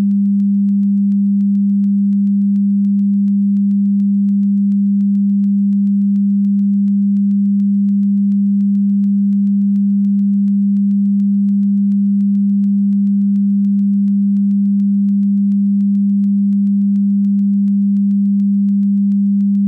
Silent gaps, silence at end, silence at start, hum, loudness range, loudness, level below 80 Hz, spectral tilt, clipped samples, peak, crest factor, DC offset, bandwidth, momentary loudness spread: none; 0 s; 0 s; none; 0 LU; -14 LUFS; -70 dBFS; -12.5 dB/octave; under 0.1%; -10 dBFS; 4 dB; under 0.1%; 0.3 kHz; 0 LU